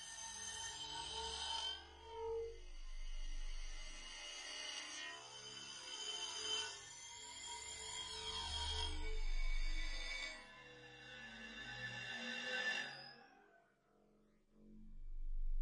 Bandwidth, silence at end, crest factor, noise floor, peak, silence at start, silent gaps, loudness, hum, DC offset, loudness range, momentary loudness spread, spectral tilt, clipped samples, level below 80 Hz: 11 kHz; 0 s; 16 dB; -74 dBFS; -30 dBFS; 0 s; none; -46 LUFS; none; under 0.1%; 4 LU; 15 LU; -1.5 dB/octave; under 0.1%; -48 dBFS